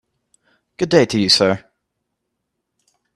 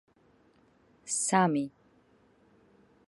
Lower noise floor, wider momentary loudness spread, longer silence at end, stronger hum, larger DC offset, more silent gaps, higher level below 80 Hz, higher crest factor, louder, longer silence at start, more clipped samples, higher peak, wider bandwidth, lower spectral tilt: first, -76 dBFS vs -65 dBFS; second, 12 LU vs 16 LU; first, 1.55 s vs 1.4 s; neither; neither; neither; first, -56 dBFS vs -76 dBFS; about the same, 20 dB vs 24 dB; first, -16 LUFS vs -29 LUFS; second, 0.8 s vs 1.05 s; neither; first, 0 dBFS vs -10 dBFS; first, 13 kHz vs 11.5 kHz; about the same, -4 dB/octave vs -4 dB/octave